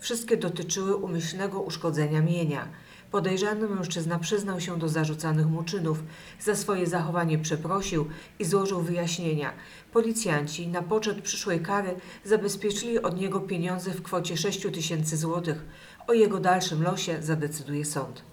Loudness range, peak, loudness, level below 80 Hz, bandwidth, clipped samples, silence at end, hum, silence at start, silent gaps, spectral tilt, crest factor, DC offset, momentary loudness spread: 2 LU; -10 dBFS; -28 LUFS; -58 dBFS; 19 kHz; under 0.1%; 0 s; none; 0 s; none; -5 dB/octave; 18 dB; under 0.1%; 7 LU